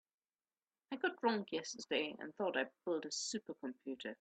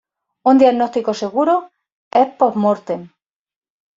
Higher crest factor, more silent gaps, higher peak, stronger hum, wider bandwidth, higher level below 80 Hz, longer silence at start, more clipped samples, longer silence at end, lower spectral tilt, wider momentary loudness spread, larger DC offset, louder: about the same, 20 dB vs 16 dB; second, none vs 1.92-2.11 s; second, -22 dBFS vs -2 dBFS; neither; first, 9 kHz vs 7.6 kHz; second, -88 dBFS vs -64 dBFS; first, 0.9 s vs 0.45 s; neither; second, 0.05 s vs 0.9 s; second, -2.5 dB/octave vs -6.5 dB/octave; about the same, 9 LU vs 9 LU; neither; second, -41 LUFS vs -16 LUFS